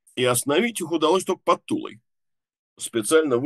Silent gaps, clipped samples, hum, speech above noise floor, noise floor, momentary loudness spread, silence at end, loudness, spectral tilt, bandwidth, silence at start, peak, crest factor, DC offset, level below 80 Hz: 2.59-2.76 s; under 0.1%; none; 60 dB; -82 dBFS; 10 LU; 0 s; -22 LUFS; -3.5 dB/octave; 13 kHz; 0.15 s; -6 dBFS; 18 dB; under 0.1%; -74 dBFS